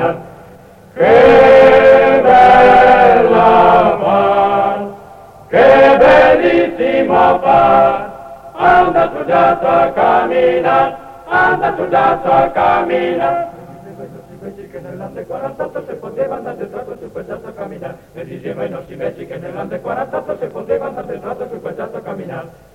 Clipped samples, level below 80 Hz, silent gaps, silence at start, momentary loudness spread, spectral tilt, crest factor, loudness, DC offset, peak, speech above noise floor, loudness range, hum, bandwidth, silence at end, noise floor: under 0.1%; -40 dBFS; none; 0 s; 22 LU; -6.5 dB/octave; 12 dB; -10 LUFS; under 0.1%; 0 dBFS; 26 dB; 18 LU; none; 7.6 kHz; 0.25 s; -39 dBFS